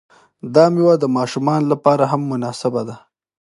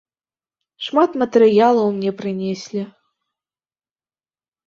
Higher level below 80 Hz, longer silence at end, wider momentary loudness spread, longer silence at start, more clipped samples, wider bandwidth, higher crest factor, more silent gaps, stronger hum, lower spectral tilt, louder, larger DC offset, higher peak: about the same, -66 dBFS vs -66 dBFS; second, 0.4 s vs 1.8 s; second, 11 LU vs 15 LU; second, 0.45 s vs 0.8 s; neither; first, 11.5 kHz vs 7.2 kHz; about the same, 16 dB vs 18 dB; neither; neither; about the same, -7 dB/octave vs -6.5 dB/octave; about the same, -17 LUFS vs -17 LUFS; neither; about the same, 0 dBFS vs -2 dBFS